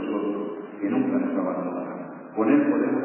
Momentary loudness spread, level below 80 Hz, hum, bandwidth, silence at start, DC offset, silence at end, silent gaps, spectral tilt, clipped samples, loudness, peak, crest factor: 13 LU; -80 dBFS; none; 3.1 kHz; 0 s; under 0.1%; 0 s; none; -7 dB/octave; under 0.1%; -25 LUFS; -8 dBFS; 16 dB